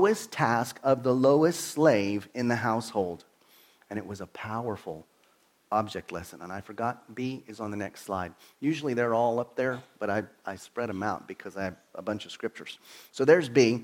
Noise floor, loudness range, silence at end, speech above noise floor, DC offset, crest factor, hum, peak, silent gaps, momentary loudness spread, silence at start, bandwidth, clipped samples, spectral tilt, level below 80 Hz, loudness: -66 dBFS; 9 LU; 0 s; 37 dB; under 0.1%; 22 dB; none; -8 dBFS; none; 17 LU; 0 s; 16.5 kHz; under 0.1%; -5.5 dB/octave; -68 dBFS; -29 LUFS